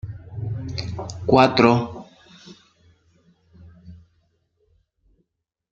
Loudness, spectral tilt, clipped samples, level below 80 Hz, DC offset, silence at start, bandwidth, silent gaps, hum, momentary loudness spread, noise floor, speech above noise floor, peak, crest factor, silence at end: -20 LUFS; -6.5 dB/octave; under 0.1%; -52 dBFS; under 0.1%; 0.05 s; 8.2 kHz; none; none; 19 LU; -78 dBFS; 60 dB; 0 dBFS; 24 dB; 1.75 s